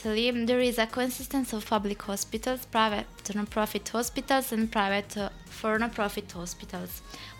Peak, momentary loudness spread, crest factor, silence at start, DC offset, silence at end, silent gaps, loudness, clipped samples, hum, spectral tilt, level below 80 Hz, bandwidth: -10 dBFS; 11 LU; 20 dB; 0 s; under 0.1%; 0 s; none; -29 LUFS; under 0.1%; none; -3.5 dB/octave; -50 dBFS; 18 kHz